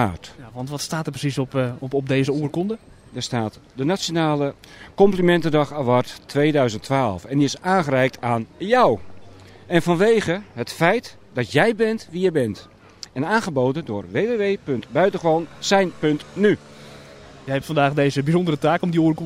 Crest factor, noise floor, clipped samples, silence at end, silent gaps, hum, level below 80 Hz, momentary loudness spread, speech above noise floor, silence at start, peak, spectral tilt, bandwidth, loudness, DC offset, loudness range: 18 dB; -43 dBFS; under 0.1%; 0 s; none; none; -52 dBFS; 11 LU; 22 dB; 0 s; -2 dBFS; -6 dB/octave; 16 kHz; -21 LUFS; under 0.1%; 4 LU